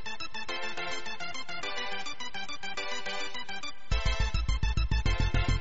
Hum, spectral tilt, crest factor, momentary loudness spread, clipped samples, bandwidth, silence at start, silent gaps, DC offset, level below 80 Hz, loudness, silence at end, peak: none; -3 dB/octave; 16 dB; 8 LU; under 0.1%; 8 kHz; 0 s; none; 2%; -34 dBFS; -34 LUFS; 0 s; -16 dBFS